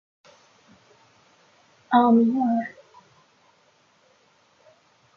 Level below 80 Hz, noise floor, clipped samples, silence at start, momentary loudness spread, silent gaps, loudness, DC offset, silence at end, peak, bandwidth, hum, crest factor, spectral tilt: -76 dBFS; -62 dBFS; under 0.1%; 1.9 s; 10 LU; none; -20 LUFS; under 0.1%; 2.5 s; -6 dBFS; 6.4 kHz; none; 22 dB; -7.5 dB/octave